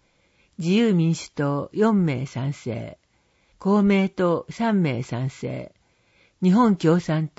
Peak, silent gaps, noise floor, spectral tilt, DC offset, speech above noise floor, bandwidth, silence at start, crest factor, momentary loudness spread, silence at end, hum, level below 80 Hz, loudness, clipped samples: -6 dBFS; none; -64 dBFS; -7.5 dB/octave; under 0.1%; 42 dB; 8 kHz; 0.6 s; 16 dB; 13 LU; 0.1 s; none; -58 dBFS; -22 LUFS; under 0.1%